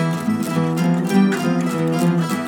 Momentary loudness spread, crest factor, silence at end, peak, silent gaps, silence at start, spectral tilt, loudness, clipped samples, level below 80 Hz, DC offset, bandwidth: 4 LU; 14 dB; 0 s; -4 dBFS; none; 0 s; -6.5 dB/octave; -19 LUFS; under 0.1%; -64 dBFS; under 0.1%; 18.5 kHz